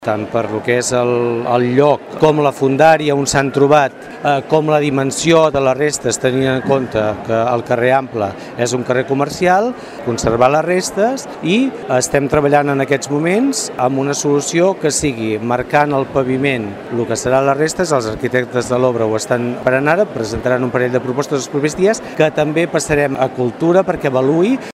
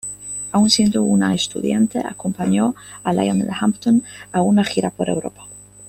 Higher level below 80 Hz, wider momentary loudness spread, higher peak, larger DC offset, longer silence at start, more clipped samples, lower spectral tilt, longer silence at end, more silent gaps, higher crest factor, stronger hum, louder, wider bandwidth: first, -44 dBFS vs -52 dBFS; second, 6 LU vs 11 LU; about the same, 0 dBFS vs 0 dBFS; neither; about the same, 0 s vs 0.05 s; neither; about the same, -5 dB/octave vs -5 dB/octave; about the same, 0.05 s vs 0 s; neither; about the same, 14 dB vs 18 dB; second, none vs 50 Hz at -40 dBFS; first, -15 LUFS vs -19 LUFS; about the same, 15 kHz vs 14.5 kHz